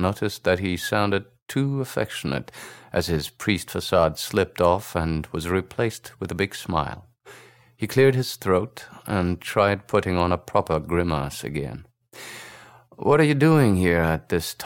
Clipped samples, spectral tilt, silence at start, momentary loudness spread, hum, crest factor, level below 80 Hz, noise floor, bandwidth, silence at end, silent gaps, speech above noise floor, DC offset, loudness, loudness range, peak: under 0.1%; -6 dB/octave; 0 s; 15 LU; none; 18 dB; -44 dBFS; -49 dBFS; 17 kHz; 0 s; 1.42-1.46 s; 26 dB; under 0.1%; -23 LUFS; 4 LU; -6 dBFS